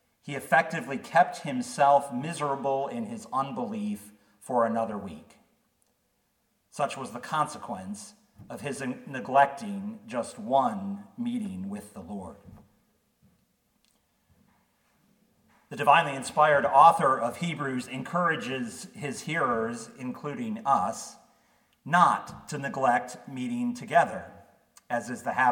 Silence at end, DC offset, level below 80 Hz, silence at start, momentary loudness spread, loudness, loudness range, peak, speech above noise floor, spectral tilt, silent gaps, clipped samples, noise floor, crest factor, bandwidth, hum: 0 s; under 0.1%; -72 dBFS; 0.25 s; 17 LU; -27 LUFS; 12 LU; -4 dBFS; 46 dB; -5 dB/octave; none; under 0.1%; -73 dBFS; 24 dB; 18 kHz; none